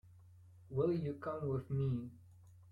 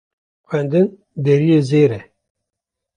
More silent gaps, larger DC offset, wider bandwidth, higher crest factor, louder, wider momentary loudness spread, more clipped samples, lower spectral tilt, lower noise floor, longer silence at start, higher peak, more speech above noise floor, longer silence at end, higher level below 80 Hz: neither; neither; second, 4.9 kHz vs 10 kHz; about the same, 16 dB vs 16 dB; second, -39 LUFS vs -16 LUFS; second, 7 LU vs 10 LU; neither; first, -10.5 dB/octave vs -8.5 dB/octave; second, -61 dBFS vs -82 dBFS; second, 0.05 s vs 0.5 s; second, -24 dBFS vs -2 dBFS; second, 23 dB vs 67 dB; second, 0 s vs 0.95 s; second, -66 dBFS vs -58 dBFS